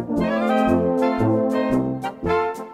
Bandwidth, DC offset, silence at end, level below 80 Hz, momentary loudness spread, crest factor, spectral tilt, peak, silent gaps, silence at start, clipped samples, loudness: 14 kHz; under 0.1%; 0 s; -46 dBFS; 4 LU; 14 dB; -7.5 dB/octave; -6 dBFS; none; 0 s; under 0.1%; -21 LUFS